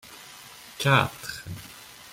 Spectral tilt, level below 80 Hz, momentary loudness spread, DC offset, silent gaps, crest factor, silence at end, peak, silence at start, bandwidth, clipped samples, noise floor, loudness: -4.5 dB/octave; -60 dBFS; 22 LU; under 0.1%; none; 24 dB; 0.05 s; -4 dBFS; 0.05 s; 16.5 kHz; under 0.1%; -46 dBFS; -25 LUFS